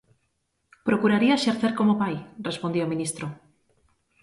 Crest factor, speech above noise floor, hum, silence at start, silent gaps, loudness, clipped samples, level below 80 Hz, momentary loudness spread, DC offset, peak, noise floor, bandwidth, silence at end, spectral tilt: 18 dB; 50 dB; none; 0.85 s; none; -24 LUFS; under 0.1%; -64 dBFS; 12 LU; under 0.1%; -8 dBFS; -74 dBFS; 11.5 kHz; 0.9 s; -5.5 dB/octave